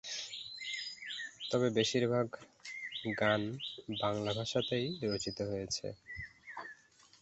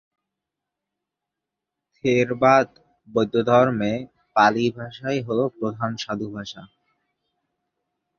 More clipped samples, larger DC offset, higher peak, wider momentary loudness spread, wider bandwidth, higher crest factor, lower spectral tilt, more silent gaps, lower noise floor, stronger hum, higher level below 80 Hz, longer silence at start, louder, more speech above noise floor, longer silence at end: neither; neither; second, -18 dBFS vs -2 dBFS; about the same, 15 LU vs 14 LU; first, 8.2 kHz vs 7.2 kHz; about the same, 20 dB vs 22 dB; second, -4.5 dB/octave vs -6 dB/octave; neither; second, -61 dBFS vs -85 dBFS; neither; about the same, -66 dBFS vs -62 dBFS; second, 0.05 s vs 2.05 s; second, -36 LUFS vs -22 LUFS; second, 26 dB vs 64 dB; second, 0.5 s vs 1.55 s